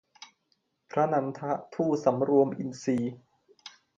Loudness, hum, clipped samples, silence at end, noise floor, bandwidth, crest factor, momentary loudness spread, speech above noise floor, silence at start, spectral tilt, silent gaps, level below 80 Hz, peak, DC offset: -28 LUFS; none; under 0.1%; 0.3 s; -75 dBFS; 7.8 kHz; 18 dB; 16 LU; 48 dB; 0.2 s; -7 dB/octave; none; -74 dBFS; -10 dBFS; under 0.1%